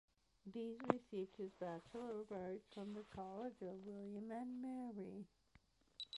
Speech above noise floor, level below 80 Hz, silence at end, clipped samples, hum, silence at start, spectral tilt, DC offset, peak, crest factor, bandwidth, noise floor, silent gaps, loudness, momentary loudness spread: 26 dB; -80 dBFS; 0 s; under 0.1%; none; 0.45 s; -6.5 dB/octave; under 0.1%; -16 dBFS; 34 dB; 11.5 kHz; -75 dBFS; none; -50 LUFS; 11 LU